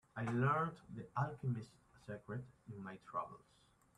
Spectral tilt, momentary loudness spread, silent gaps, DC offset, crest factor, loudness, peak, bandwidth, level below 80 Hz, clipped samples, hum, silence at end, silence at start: -8.5 dB/octave; 18 LU; none; under 0.1%; 20 dB; -42 LUFS; -24 dBFS; 10 kHz; -74 dBFS; under 0.1%; none; 0.6 s; 0.15 s